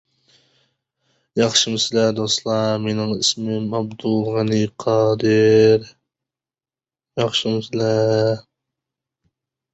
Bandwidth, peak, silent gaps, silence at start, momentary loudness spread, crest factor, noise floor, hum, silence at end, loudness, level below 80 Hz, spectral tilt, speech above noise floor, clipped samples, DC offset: 8.2 kHz; -2 dBFS; none; 1.35 s; 9 LU; 18 dB; under -90 dBFS; none; 1.35 s; -19 LUFS; -58 dBFS; -4.5 dB/octave; over 72 dB; under 0.1%; under 0.1%